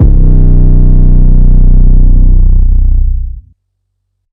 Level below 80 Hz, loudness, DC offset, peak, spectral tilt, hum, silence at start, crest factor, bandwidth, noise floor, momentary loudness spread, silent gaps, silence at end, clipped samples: -4 dBFS; -10 LUFS; under 0.1%; 0 dBFS; -13.5 dB/octave; none; 0 s; 4 dB; 1.1 kHz; -64 dBFS; 7 LU; none; 0.9 s; 30%